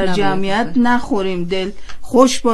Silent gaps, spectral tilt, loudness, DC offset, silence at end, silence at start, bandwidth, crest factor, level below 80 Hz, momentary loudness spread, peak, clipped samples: none; -4.5 dB/octave; -17 LUFS; under 0.1%; 0 s; 0 s; 13 kHz; 14 dB; -38 dBFS; 8 LU; 0 dBFS; under 0.1%